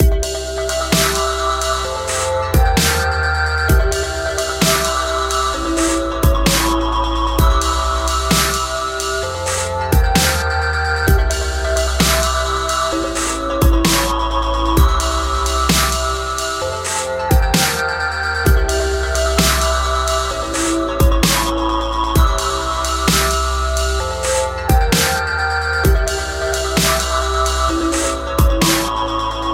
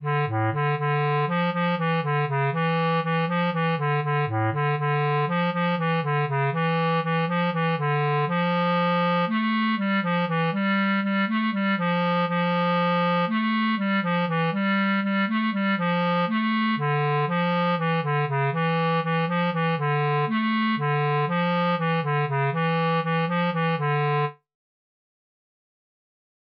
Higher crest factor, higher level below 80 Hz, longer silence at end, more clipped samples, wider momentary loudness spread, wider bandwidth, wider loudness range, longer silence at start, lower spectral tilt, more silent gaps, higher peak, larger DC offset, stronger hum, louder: first, 16 dB vs 8 dB; first, -20 dBFS vs -76 dBFS; second, 0 s vs 2.2 s; neither; first, 5 LU vs 2 LU; first, 16.5 kHz vs 5.4 kHz; about the same, 1 LU vs 1 LU; about the same, 0 s vs 0 s; second, -3.5 dB/octave vs -5 dB/octave; neither; first, 0 dBFS vs -16 dBFS; neither; neither; first, -16 LUFS vs -24 LUFS